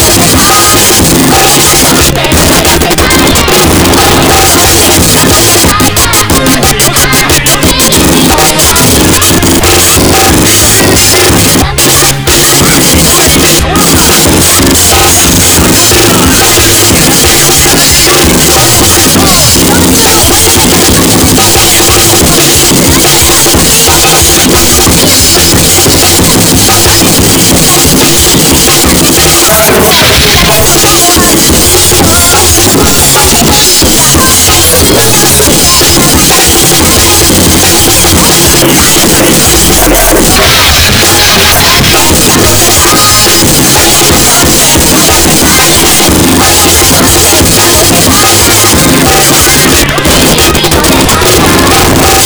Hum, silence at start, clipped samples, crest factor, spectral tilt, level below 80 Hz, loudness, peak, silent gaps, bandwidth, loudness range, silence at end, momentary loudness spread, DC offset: none; 0 s; 10%; 4 dB; -2.5 dB/octave; -18 dBFS; -2 LUFS; 0 dBFS; none; over 20 kHz; 1 LU; 0 s; 2 LU; under 0.1%